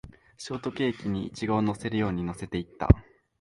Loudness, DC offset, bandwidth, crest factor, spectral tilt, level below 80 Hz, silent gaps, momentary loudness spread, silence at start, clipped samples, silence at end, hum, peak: -29 LUFS; under 0.1%; 11.5 kHz; 28 dB; -7 dB/octave; -36 dBFS; none; 11 LU; 0.05 s; under 0.1%; 0.4 s; none; 0 dBFS